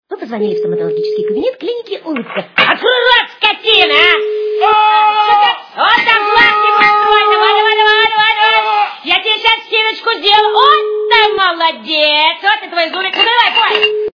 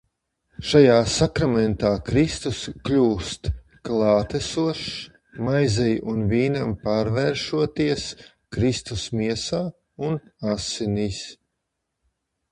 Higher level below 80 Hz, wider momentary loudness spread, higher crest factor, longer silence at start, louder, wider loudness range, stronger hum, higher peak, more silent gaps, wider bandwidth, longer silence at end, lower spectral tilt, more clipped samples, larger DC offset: second, -52 dBFS vs -42 dBFS; about the same, 9 LU vs 11 LU; second, 12 dB vs 22 dB; second, 0.1 s vs 0.6 s; first, -10 LUFS vs -23 LUFS; second, 2 LU vs 6 LU; neither; about the same, 0 dBFS vs -2 dBFS; neither; second, 5.4 kHz vs 11.5 kHz; second, 0.05 s vs 1.2 s; second, -3.5 dB/octave vs -5.5 dB/octave; first, 0.2% vs under 0.1%; neither